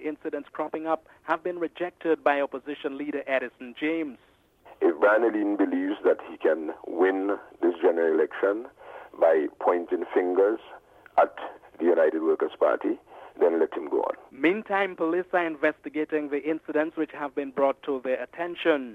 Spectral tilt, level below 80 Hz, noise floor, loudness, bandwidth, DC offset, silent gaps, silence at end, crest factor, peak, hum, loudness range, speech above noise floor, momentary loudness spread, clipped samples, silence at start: -6.5 dB/octave; -72 dBFS; -54 dBFS; -26 LUFS; 5.2 kHz; under 0.1%; none; 0 s; 18 dB; -8 dBFS; none; 4 LU; 28 dB; 10 LU; under 0.1%; 0 s